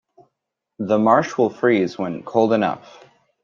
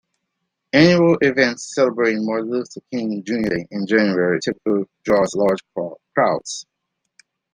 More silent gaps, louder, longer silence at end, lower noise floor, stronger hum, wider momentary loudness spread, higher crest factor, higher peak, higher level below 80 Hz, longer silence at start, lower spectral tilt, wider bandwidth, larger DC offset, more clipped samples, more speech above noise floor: neither; about the same, -19 LUFS vs -19 LUFS; second, 0.65 s vs 0.9 s; about the same, -80 dBFS vs -77 dBFS; neither; about the same, 11 LU vs 11 LU; about the same, 18 dB vs 18 dB; about the same, -2 dBFS vs -2 dBFS; second, -66 dBFS vs -56 dBFS; about the same, 0.8 s vs 0.75 s; about the same, -6.5 dB/octave vs -5.5 dB/octave; second, 7.4 kHz vs 10 kHz; neither; neither; about the same, 61 dB vs 58 dB